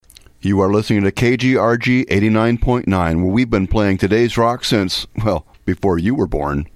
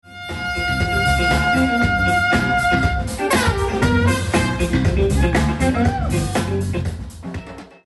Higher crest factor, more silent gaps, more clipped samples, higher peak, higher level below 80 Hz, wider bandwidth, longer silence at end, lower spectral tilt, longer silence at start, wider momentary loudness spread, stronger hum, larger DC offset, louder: about the same, 16 dB vs 12 dB; neither; neither; first, 0 dBFS vs -6 dBFS; about the same, -32 dBFS vs -28 dBFS; first, 15 kHz vs 12 kHz; about the same, 0.1 s vs 0.2 s; about the same, -6.5 dB/octave vs -5.5 dB/octave; first, 0.45 s vs 0.05 s; second, 6 LU vs 11 LU; neither; neither; about the same, -16 LUFS vs -18 LUFS